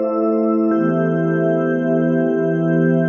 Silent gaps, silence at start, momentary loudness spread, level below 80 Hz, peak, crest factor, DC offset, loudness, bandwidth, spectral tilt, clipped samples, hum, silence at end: none; 0 s; 1 LU; -76 dBFS; -4 dBFS; 12 dB; under 0.1%; -17 LUFS; 3.3 kHz; -10.5 dB/octave; under 0.1%; none; 0 s